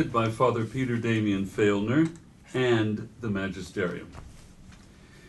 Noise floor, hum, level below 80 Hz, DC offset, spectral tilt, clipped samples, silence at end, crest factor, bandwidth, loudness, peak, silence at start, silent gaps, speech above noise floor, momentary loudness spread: -51 dBFS; none; -52 dBFS; under 0.1%; -7 dB/octave; under 0.1%; 0 s; 16 dB; 12.5 kHz; -27 LUFS; -10 dBFS; 0 s; none; 25 dB; 9 LU